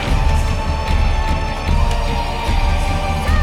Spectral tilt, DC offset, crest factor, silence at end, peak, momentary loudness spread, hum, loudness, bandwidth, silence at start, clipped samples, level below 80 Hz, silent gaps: -5.5 dB/octave; under 0.1%; 12 dB; 0 s; -4 dBFS; 3 LU; none; -19 LUFS; 13 kHz; 0 s; under 0.1%; -18 dBFS; none